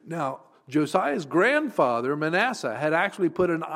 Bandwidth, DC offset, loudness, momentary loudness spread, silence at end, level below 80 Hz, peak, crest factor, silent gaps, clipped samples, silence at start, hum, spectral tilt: 15 kHz; under 0.1%; -25 LUFS; 8 LU; 0 s; -66 dBFS; -8 dBFS; 16 dB; none; under 0.1%; 0.05 s; none; -5.5 dB/octave